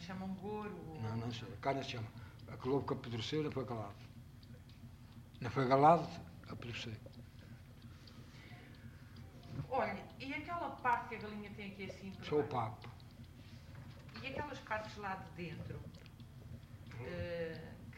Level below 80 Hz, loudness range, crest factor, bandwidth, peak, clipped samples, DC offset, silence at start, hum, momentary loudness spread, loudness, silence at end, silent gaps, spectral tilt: -64 dBFS; 10 LU; 26 dB; 16 kHz; -16 dBFS; under 0.1%; under 0.1%; 0 s; none; 19 LU; -40 LUFS; 0 s; none; -6.5 dB/octave